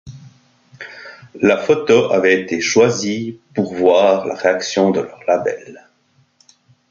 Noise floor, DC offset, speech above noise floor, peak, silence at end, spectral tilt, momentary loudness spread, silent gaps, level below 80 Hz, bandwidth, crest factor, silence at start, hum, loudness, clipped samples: -58 dBFS; under 0.1%; 43 dB; 0 dBFS; 1.1 s; -4.5 dB/octave; 20 LU; none; -58 dBFS; 7.6 kHz; 18 dB; 0.05 s; none; -16 LUFS; under 0.1%